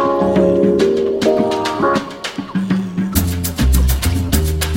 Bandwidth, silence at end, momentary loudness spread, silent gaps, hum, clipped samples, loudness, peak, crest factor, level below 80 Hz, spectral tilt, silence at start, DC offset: 17 kHz; 0 s; 6 LU; none; none; under 0.1%; -16 LUFS; 0 dBFS; 14 dB; -22 dBFS; -5.5 dB/octave; 0 s; under 0.1%